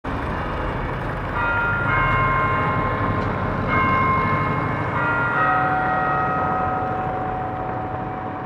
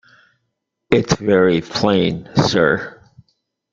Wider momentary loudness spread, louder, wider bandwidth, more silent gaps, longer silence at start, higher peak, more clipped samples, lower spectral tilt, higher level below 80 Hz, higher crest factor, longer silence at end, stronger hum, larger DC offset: first, 8 LU vs 4 LU; second, -21 LUFS vs -17 LUFS; first, 10 kHz vs 7.6 kHz; neither; second, 0.05 s vs 0.9 s; second, -6 dBFS vs 0 dBFS; neither; first, -8 dB/octave vs -5.5 dB/octave; first, -36 dBFS vs -48 dBFS; about the same, 16 dB vs 18 dB; second, 0 s vs 0.8 s; neither; neither